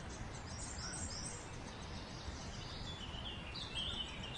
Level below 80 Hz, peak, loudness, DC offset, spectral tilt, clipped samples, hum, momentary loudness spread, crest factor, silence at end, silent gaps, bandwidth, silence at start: -54 dBFS; -30 dBFS; -45 LUFS; under 0.1%; -3 dB/octave; under 0.1%; none; 7 LU; 16 dB; 0 s; none; 11.5 kHz; 0 s